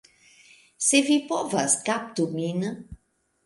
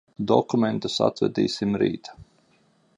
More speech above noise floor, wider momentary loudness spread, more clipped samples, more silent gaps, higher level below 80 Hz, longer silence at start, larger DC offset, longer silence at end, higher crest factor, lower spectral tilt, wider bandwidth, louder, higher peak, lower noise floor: about the same, 42 dB vs 39 dB; first, 10 LU vs 5 LU; neither; neither; about the same, -60 dBFS vs -60 dBFS; first, 0.8 s vs 0.2 s; neither; second, 0.5 s vs 0.75 s; about the same, 20 dB vs 22 dB; second, -3 dB/octave vs -6 dB/octave; about the same, 11.5 kHz vs 11 kHz; about the same, -24 LUFS vs -24 LUFS; second, -8 dBFS vs -4 dBFS; first, -67 dBFS vs -63 dBFS